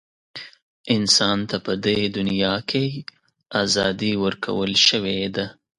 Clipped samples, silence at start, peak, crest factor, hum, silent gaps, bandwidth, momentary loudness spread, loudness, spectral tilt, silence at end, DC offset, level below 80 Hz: under 0.1%; 0.35 s; -2 dBFS; 22 dB; none; 0.62-0.84 s; 11.5 kHz; 19 LU; -20 LUFS; -3.5 dB/octave; 0.25 s; under 0.1%; -54 dBFS